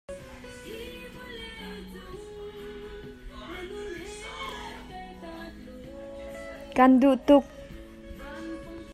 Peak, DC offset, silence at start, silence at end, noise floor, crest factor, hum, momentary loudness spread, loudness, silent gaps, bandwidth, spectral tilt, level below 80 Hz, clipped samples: -6 dBFS; under 0.1%; 0.1 s; 0 s; -44 dBFS; 24 dB; none; 23 LU; -25 LUFS; none; 14 kHz; -5.5 dB/octave; -50 dBFS; under 0.1%